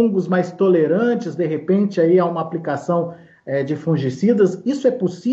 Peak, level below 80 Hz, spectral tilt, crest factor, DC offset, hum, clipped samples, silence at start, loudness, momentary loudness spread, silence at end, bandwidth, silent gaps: -4 dBFS; -68 dBFS; -8 dB/octave; 14 dB; under 0.1%; none; under 0.1%; 0 s; -19 LUFS; 8 LU; 0 s; 7.8 kHz; none